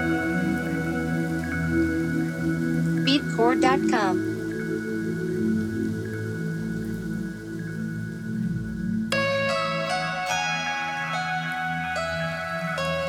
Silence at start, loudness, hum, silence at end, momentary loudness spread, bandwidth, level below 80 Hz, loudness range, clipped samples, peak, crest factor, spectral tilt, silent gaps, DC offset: 0 s; -26 LUFS; none; 0 s; 8 LU; 16 kHz; -48 dBFS; 6 LU; under 0.1%; -8 dBFS; 18 dB; -5.5 dB/octave; none; under 0.1%